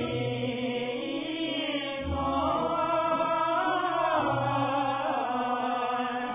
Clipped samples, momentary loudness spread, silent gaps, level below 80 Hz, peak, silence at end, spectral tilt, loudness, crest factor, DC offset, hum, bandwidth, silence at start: under 0.1%; 5 LU; none; -50 dBFS; -14 dBFS; 0 s; -3.5 dB/octave; -29 LUFS; 14 dB; under 0.1%; none; 3.9 kHz; 0 s